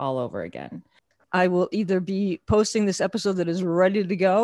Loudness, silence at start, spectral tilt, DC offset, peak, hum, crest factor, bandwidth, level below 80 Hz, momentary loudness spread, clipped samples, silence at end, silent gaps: -23 LUFS; 0 s; -5.5 dB/octave; under 0.1%; -6 dBFS; none; 16 dB; 12 kHz; -50 dBFS; 13 LU; under 0.1%; 0 s; none